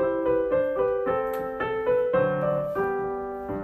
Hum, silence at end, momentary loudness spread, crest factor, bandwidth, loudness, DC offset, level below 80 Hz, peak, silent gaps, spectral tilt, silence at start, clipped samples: none; 0 s; 6 LU; 14 dB; 14.5 kHz; -26 LUFS; under 0.1%; -52 dBFS; -12 dBFS; none; -8 dB/octave; 0 s; under 0.1%